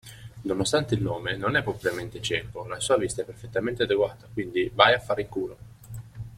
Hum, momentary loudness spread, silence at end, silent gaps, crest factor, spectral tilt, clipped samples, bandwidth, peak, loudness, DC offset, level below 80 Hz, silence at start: none; 16 LU; 0 s; none; 24 dB; -4.5 dB/octave; under 0.1%; 16.5 kHz; -2 dBFS; -26 LUFS; under 0.1%; -52 dBFS; 0.05 s